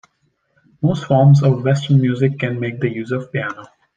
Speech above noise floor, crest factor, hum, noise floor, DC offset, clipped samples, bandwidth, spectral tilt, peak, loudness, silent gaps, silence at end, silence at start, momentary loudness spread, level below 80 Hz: 50 dB; 16 dB; none; -65 dBFS; under 0.1%; under 0.1%; 7.4 kHz; -8 dB/octave; -2 dBFS; -17 LUFS; none; 0.3 s; 0.8 s; 12 LU; -58 dBFS